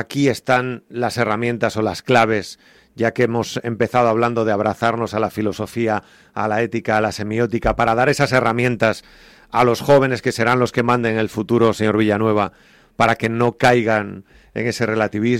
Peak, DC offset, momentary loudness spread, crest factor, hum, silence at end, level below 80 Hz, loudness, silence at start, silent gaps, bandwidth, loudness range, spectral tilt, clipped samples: -4 dBFS; under 0.1%; 8 LU; 14 dB; none; 0 s; -44 dBFS; -18 LUFS; 0 s; none; 16 kHz; 3 LU; -6 dB/octave; under 0.1%